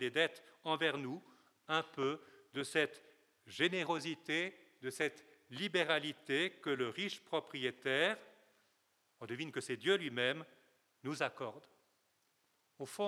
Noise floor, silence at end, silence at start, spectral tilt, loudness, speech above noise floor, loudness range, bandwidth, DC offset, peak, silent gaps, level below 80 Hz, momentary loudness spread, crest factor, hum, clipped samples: -78 dBFS; 0 s; 0 s; -4 dB/octave; -38 LUFS; 40 dB; 3 LU; 14.5 kHz; under 0.1%; -16 dBFS; none; under -90 dBFS; 13 LU; 24 dB; none; under 0.1%